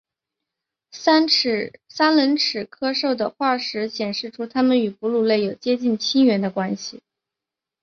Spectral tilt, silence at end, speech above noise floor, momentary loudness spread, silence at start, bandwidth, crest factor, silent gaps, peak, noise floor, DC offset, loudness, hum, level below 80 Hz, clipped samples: -4.5 dB/octave; 0.85 s; 67 dB; 9 LU; 0.95 s; 7.2 kHz; 18 dB; none; -4 dBFS; -87 dBFS; under 0.1%; -20 LUFS; none; -66 dBFS; under 0.1%